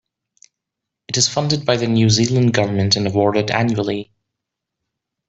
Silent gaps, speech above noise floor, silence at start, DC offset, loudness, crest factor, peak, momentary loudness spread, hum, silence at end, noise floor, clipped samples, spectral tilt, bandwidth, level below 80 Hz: none; 66 dB; 1.1 s; under 0.1%; -17 LUFS; 18 dB; -2 dBFS; 7 LU; none; 1.25 s; -82 dBFS; under 0.1%; -4.5 dB/octave; 8 kHz; -52 dBFS